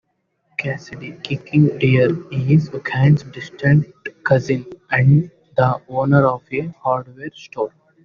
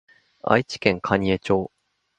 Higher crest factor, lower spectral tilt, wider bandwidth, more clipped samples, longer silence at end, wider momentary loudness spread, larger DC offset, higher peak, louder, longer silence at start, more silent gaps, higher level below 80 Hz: second, 16 dB vs 24 dB; about the same, -7 dB/octave vs -6 dB/octave; second, 7 kHz vs 9.2 kHz; neither; second, 0.35 s vs 0.5 s; first, 14 LU vs 8 LU; neither; about the same, -2 dBFS vs 0 dBFS; first, -18 LUFS vs -22 LUFS; first, 0.6 s vs 0.45 s; neither; about the same, -52 dBFS vs -50 dBFS